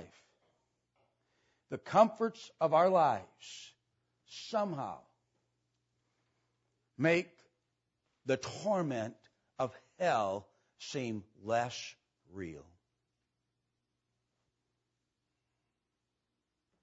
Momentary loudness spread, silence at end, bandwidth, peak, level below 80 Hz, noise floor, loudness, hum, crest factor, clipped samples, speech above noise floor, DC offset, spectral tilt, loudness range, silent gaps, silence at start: 21 LU; 4.2 s; 7.6 kHz; -12 dBFS; -78 dBFS; -86 dBFS; -33 LUFS; 60 Hz at -75 dBFS; 26 dB; under 0.1%; 53 dB; under 0.1%; -4.5 dB/octave; 11 LU; none; 0 s